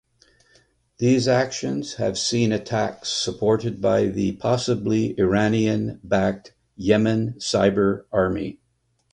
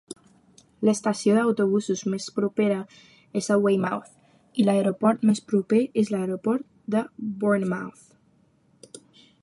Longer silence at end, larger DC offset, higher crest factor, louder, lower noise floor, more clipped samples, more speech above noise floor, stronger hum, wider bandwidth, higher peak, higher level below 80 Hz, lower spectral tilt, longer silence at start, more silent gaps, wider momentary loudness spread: first, 0.6 s vs 0.45 s; neither; about the same, 18 dB vs 18 dB; about the same, -22 LUFS vs -24 LUFS; first, -68 dBFS vs -62 dBFS; neither; first, 47 dB vs 39 dB; neither; about the same, 10.5 kHz vs 11.5 kHz; first, -4 dBFS vs -8 dBFS; first, -50 dBFS vs -70 dBFS; about the same, -5.5 dB/octave vs -6 dB/octave; first, 1 s vs 0.1 s; neither; second, 6 LU vs 11 LU